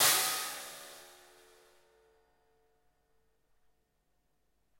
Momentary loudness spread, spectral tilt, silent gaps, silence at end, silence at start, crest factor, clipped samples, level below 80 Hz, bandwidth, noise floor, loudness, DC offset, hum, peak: 26 LU; 1 dB/octave; none; 3.75 s; 0 s; 26 dB; under 0.1%; -80 dBFS; 16.5 kHz; -79 dBFS; -31 LUFS; under 0.1%; none; -12 dBFS